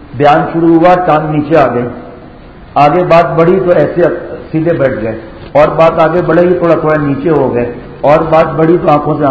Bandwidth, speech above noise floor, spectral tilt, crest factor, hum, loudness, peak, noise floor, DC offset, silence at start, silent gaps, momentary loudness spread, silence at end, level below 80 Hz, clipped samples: 8 kHz; 24 dB; -9 dB/octave; 8 dB; none; -9 LUFS; 0 dBFS; -32 dBFS; 0.4%; 0 s; none; 10 LU; 0 s; -36 dBFS; 2%